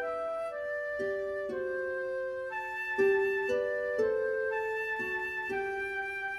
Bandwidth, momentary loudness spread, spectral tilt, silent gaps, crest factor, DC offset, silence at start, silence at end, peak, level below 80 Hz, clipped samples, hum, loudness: 13 kHz; 7 LU; -5 dB/octave; none; 16 dB; under 0.1%; 0 s; 0 s; -18 dBFS; -66 dBFS; under 0.1%; none; -32 LUFS